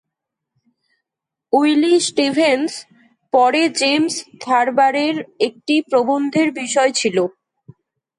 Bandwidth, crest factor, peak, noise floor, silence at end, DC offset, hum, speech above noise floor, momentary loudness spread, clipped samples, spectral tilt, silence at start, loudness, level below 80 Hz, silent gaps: 11.5 kHz; 14 dB; -4 dBFS; -84 dBFS; 0.9 s; under 0.1%; none; 68 dB; 7 LU; under 0.1%; -3 dB/octave; 1.55 s; -17 LUFS; -70 dBFS; none